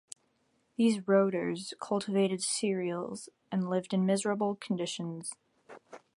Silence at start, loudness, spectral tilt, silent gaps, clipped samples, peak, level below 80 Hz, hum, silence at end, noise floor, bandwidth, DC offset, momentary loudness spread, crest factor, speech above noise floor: 0.8 s; -31 LUFS; -5 dB/octave; none; under 0.1%; -12 dBFS; -78 dBFS; none; 0.2 s; -74 dBFS; 11.5 kHz; under 0.1%; 17 LU; 20 dB; 42 dB